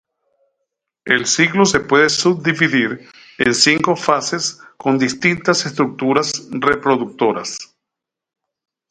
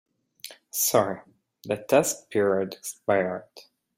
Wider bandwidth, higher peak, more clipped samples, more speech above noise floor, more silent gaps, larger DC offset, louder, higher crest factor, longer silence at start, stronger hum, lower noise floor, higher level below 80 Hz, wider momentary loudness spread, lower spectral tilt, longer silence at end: second, 11 kHz vs 16.5 kHz; first, 0 dBFS vs -6 dBFS; neither; first, 67 dB vs 22 dB; neither; neither; first, -16 LUFS vs -25 LUFS; about the same, 18 dB vs 20 dB; first, 1.05 s vs 0.45 s; neither; first, -83 dBFS vs -47 dBFS; first, -54 dBFS vs -68 dBFS; second, 10 LU vs 20 LU; about the same, -3.5 dB/octave vs -3.5 dB/octave; first, 1.25 s vs 0.35 s